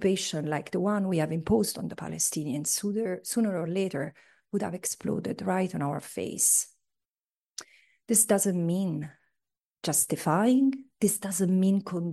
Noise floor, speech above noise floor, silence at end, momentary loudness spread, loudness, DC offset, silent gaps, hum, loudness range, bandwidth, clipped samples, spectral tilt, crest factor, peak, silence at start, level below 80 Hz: under -90 dBFS; over 62 dB; 0 s; 13 LU; -27 LUFS; under 0.1%; 7.11-7.24 s, 7.37-7.41 s, 9.67-9.71 s; none; 4 LU; 12.5 kHz; under 0.1%; -4.5 dB/octave; 18 dB; -10 dBFS; 0 s; -64 dBFS